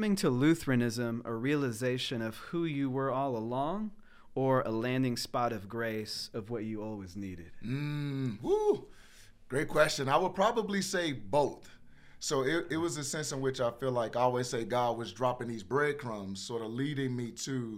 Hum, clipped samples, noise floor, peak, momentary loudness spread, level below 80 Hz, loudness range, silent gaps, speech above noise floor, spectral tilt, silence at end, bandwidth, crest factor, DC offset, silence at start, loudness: none; under 0.1%; -55 dBFS; -12 dBFS; 10 LU; -58 dBFS; 4 LU; none; 22 dB; -5 dB/octave; 0 s; 16.5 kHz; 20 dB; under 0.1%; 0 s; -33 LUFS